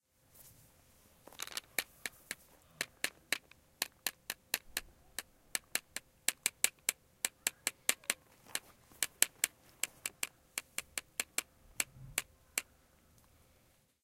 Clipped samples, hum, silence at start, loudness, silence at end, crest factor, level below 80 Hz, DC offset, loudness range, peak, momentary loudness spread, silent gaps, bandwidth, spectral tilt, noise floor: under 0.1%; none; 0.4 s; -38 LUFS; 1.4 s; 40 dB; -70 dBFS; under 0.1%; 6 LU; -4 dBFS; 14 LU; none; 17 kHz; 1 dB/octave; -70 dBFS